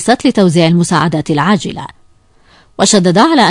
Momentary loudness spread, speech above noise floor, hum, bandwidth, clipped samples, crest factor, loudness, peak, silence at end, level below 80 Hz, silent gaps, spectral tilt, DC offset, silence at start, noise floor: 11 LU; 37 dB; none; 11 kHz; 0.3%; 12 dB; -10 LUFS; 0 dBFS; 0 s; -48 dBFS; none; -5 dB/octave; under 0.1%; 0 s; -47 dBFS